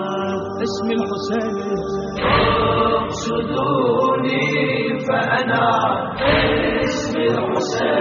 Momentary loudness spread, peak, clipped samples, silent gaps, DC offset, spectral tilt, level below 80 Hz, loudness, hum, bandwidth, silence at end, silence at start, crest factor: 7 LU; -2 dBFS; under 0.1%; none; under 0.1%; -3.5 dB/octave; -40 dBFS; -19 LUFS; none; 7.2 kHz; 0 s; 0 s; 16 dB